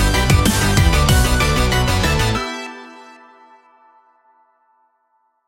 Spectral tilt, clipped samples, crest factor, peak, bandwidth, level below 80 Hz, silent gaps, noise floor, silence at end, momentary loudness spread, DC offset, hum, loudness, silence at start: -4.5 dB/octave; under 0.1%; 16 dB; -2 dBFS; 17 kHz; -22 dBFS; none; -64 dBFS; 2.45 s; 15 LU; under 0.1%; none; -16 LUFS; 0 s